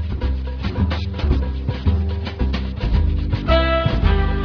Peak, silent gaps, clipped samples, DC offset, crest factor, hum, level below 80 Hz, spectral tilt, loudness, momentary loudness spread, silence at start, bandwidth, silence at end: -2 dBFS; none; under 0.1%; under 0.1%; 16 dB; none; -22 dBFS; -8.5 dB/octave; -21 LUFS; 7 LU; 0 s; 5.4 kHz; 0 s